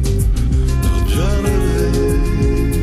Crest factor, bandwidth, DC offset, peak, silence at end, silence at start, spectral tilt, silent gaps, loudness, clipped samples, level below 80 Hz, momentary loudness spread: 8 dB; 15 kHz; under 0.1%; -6 dBFS; 0 s; 0 s; -6.5 dB/octave; none; -17 LUFS; under 0.1%; -16 dBFS; 1 LU